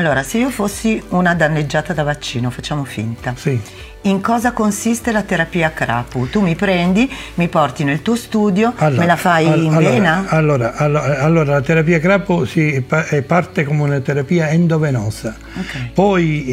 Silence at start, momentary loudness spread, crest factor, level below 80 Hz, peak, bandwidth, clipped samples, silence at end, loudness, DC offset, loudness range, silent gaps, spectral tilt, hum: 0 s; 8 LU; 16 dB; -40 dBFS; 0 dBFS; 15.5 kHz; under 0.1%; 0 s; -16 LUFS; under 0.1%; 5 LU; none; -6 dB/octave; none